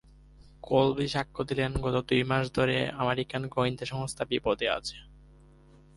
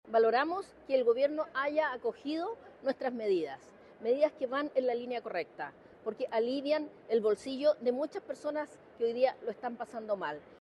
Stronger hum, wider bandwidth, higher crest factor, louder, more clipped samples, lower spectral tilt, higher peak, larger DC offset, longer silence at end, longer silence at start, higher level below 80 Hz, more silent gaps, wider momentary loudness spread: neither; about the same, 11.5 kHz vs 11 kHz; about the same, 20 dB vs 18 dB; first, -29 LUFS vs -33 LUFS; neither; about the same, -5.5 dB/octave vs -5 dB/octave; first, -10 dBFS vs -16 dBFS; neither; first, 0.8 s vs 0.2 s; first, 0.4 s vs 0.05 s; first, -50 dBFS vs -78 dBFS; neither; second, 8 LU vs 11 LU